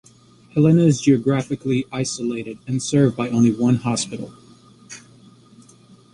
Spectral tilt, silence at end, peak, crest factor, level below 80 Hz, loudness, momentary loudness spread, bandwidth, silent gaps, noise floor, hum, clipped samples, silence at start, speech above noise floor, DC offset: -6 dB/octave; 1.15 s; -4 dBFS; 16 dB; -56 dBFS; -19 LUFS; 20 LU; 11.5 kHz; none; -50 dBFS; none; under 0.1%; 0.55 s; 32 dB; under 0.1%